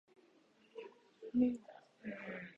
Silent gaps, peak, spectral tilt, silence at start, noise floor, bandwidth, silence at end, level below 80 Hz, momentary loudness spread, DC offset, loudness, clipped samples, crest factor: none; -22 dBFS; -7.5 dB/octave; 0.75 s; -70 dBFS; 4.4 kHz; 0.05 s; -76 dBFS; 22 LU; under 0.1%; -40 LUFS; under 0.1%; 20 dB